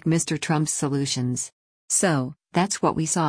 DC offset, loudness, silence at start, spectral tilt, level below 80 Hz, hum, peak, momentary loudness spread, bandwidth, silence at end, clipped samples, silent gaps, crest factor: under 0.1%; -24 LUFS; 0.05 s; -4 dB/octave; -58 dBFS; none; -8 dBFS; 6 LU; 10.5 kHz; 0 s; under 0.1%; 1.52-1.88 s; 16 dB